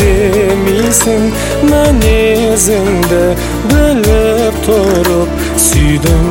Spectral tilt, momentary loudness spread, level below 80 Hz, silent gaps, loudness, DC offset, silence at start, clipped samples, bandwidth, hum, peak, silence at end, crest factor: -4.5 dB/octave; 3 LU; -18 dBFS; none; -10 LUFS; under 0.1%; 0 s; under 0.1%; 17 kHz; none; 0 dBFS; 0 s; 10 dB